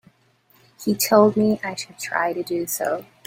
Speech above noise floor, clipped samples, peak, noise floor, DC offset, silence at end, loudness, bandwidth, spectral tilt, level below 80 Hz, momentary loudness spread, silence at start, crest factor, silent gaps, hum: 39 dB; under 0.1%; -2 dBFS; -60 dBFS; under 0.1%; 0.25 s; -21 LUFS; 16.5 kHz; -4 dB/octave; -64 dBFS; 13 LU; 0.8 s; 20 dB; none; none